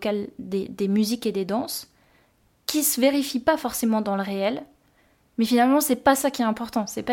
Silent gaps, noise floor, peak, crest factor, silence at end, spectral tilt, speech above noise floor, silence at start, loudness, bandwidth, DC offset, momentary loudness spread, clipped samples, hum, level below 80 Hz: none; -63 dBFS; -4 dBFS; 20 dB; 0 s; -4 dB/octave; 40 dB; 0 s; -23 LUFS; 17 kHz; under 0.1%; 11 LU; under 0.1%; none; -60 dBFS